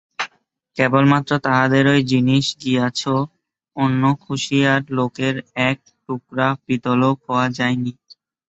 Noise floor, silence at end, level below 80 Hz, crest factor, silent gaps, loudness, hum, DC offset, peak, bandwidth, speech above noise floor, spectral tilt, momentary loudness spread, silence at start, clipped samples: -59 dBFS; 0.55 s; -58 dBFS; 18 dB; none; -19 LUFS; none; under 0.1%; -2 dBFS; 8.2 kHz; 41 dB; -6 dB/octave; 13 LU; 0.2 s; under 0.1%